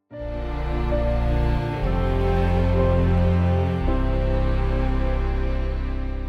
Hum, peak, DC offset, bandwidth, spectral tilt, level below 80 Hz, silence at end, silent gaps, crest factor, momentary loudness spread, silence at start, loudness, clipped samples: none; -8 dBFS; under 0.1%; 6.2 kHz; -9 dB/octave; -24 dBFS; 0 s; none; 12 dB; 8 LU; 0.1 s; -23 LUFS; under 0.1%